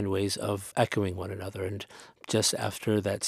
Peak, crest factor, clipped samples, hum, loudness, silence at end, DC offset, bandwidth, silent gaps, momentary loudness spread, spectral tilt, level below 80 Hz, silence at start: -10 dBFS; 20 dB; under 0.1%; none; -30 LUFS; 0 s; under 0.1%; 15.5 kHz; none; 11 LU; -4 dB/octave; -62 dBFS; 0 s